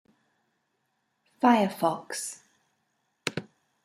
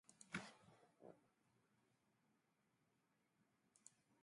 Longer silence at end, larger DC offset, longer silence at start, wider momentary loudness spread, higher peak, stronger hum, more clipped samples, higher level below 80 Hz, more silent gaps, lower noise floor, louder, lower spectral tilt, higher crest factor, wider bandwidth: first, 0.4 s vs 0 s; neither; first, 1.4 s vs 0.05 s; about the same, 16 LU vs 16 LU; first, -8 dBFS vs -32 dBFS; neither; neither; first, -76 dBFS vs under -90 dBFS; neither; second, -77 dBFS vs -85 dBFS; first, -27 LUFS vs -57 LUFS; about the same, -4.5 dB/octave vs -3.5 dB/octave; second, 24 dB vs 32 dB; first, 15.5 kHz vs 11 kHz